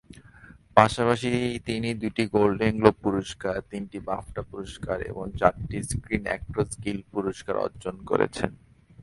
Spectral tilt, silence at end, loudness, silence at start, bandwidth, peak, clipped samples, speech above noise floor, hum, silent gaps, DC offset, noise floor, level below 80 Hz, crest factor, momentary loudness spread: -6 dB/octave; 0 s; -27 LUFS; 0.1 s; 11.5 kHz; 0 dBFS; under 0.1%; 25 dB; none; none; under 0.1%; -51 dBFS; -46 dBFS; 26 dB; 12 LU